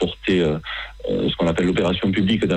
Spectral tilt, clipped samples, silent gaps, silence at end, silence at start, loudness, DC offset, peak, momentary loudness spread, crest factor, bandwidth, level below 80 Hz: -6.5 dB/octave; under 0.1%; none; 0 s; 0 s; -21 LUFS; under 0.1%; -8 dBFS; 7 LU; 12 dB; 8.8 kHz; -40 dBFS